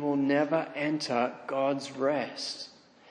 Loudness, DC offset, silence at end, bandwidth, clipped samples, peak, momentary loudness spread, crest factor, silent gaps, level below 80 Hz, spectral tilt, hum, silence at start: -30 LUFS; under 0.1%; 0.4 s; 10 kHz; under 0.1%; -14 dBFS; 9 LU; 16 dB; none; -82 dBFS; -5 dB/octave; none; 0 s